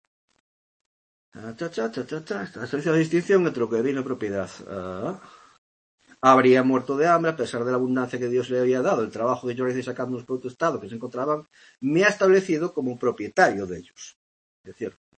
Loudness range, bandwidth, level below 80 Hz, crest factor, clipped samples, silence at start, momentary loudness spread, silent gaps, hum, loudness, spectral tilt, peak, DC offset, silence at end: 5 LU; 8.8 kHz; -68 dBFS; 20 dB; under 0.1%; 1.35 s; 15 LU; 5.58-5.98 s, 14.16-14.64 s; none; -24 LUFS; -6 dB/octave; -4 dBFS; under 0.1%; 0.3 s